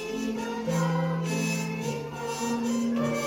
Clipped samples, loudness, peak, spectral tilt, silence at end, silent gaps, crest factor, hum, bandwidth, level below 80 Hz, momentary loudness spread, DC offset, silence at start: under 0.1%; -29 LUFS; -16 dBFS; -5.5 dB/octave; 0 s; none; 14 dB; none; 16.5 kHz; -60 dBFS; 5 LU; under 0.1%; 0 s